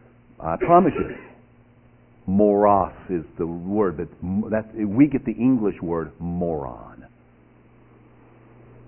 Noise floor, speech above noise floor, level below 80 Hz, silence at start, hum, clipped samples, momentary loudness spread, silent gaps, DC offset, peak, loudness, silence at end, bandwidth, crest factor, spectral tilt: -53 dBFS; 32 dB; -46 dBFS; 0.4 s; 60 Hz at -50 dBFS; under 0.1%; 14 LU; none; under 0.1%; -2 dBFS; -22 LUFS; 1.85 s; 3.2 kHz; 22 dB; -12.5 dB/octave